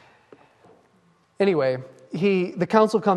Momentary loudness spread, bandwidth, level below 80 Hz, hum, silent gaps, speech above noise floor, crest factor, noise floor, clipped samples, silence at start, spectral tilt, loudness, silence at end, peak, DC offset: 9 LU; 11.5 kHz; -70 dBFS; none; none; 40 dB; 20 dB; -61 dBFS; under 0.1%; 1.4 s; -7 dB/octave; -22 LUFS; 0 s; -4 dBFS; under 0.1%